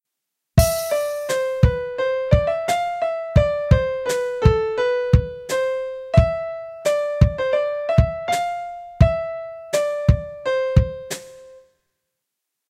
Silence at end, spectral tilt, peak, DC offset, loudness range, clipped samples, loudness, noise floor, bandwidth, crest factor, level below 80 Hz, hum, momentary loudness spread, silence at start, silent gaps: 1.1 s; -6 dB/octave; 0 dBFS; under 0.1%; 2 LU; under 0.1%; -21 LUFS; -81 dBFS; 16.5 kHz; 20 dB; -28 dBFS; none; 9 LU; 0.55 s; none